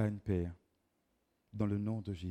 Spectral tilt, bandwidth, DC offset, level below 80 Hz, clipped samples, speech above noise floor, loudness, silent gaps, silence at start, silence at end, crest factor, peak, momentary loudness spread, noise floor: -9 dB/octave; 8.8 kHz; under 0.1%; -62 dBFS; under 0.1%; 43 dB; -38 LUFS; none; 0 s; 0 s; 16 dB; -22 dBFS; 8 LU; -79 dBFS